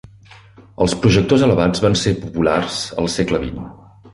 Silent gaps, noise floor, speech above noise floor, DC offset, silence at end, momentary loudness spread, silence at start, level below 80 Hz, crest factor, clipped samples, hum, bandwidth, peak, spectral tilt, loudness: none; -44 dBFS; 28 dB; under 0.1%; 0.05 s; 9 LU; 0.6 s; -38 dBFS; 16 dB; under 0.1%; none; 11.5 kHz; -2 dBFS; -5.5 dB/octave; -17 LUFS